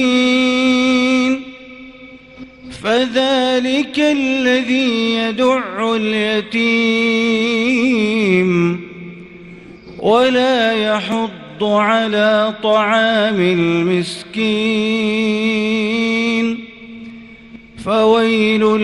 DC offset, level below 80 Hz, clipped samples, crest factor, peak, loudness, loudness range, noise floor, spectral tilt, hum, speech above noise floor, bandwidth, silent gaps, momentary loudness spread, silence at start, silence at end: under 0.1%; -52 dBFS; under 0.1%; 14 dB; -2 dBFS; -15 LUFS; 3 LU; -38 dBFS; -5 dB/octave; none; 24 dB; 11 kHz; none; 12 LU; 0 s; 0 s